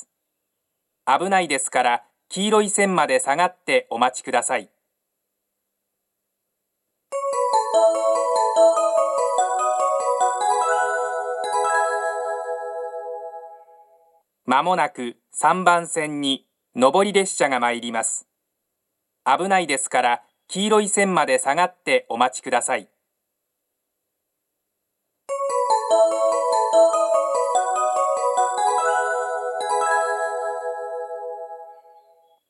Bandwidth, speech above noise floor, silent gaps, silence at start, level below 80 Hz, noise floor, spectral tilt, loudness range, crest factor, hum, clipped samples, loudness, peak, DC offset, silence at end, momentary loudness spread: 12.5 kHz; 58 dB; none; 1.05 s; -80 dBFS; -79 dBFS; -2.5 dB/octave; 7 LU; 22 dB; none; under 0.1%; -21 LUFS; 0 dBFS; under 0.1%; 0.75 s; 12 LU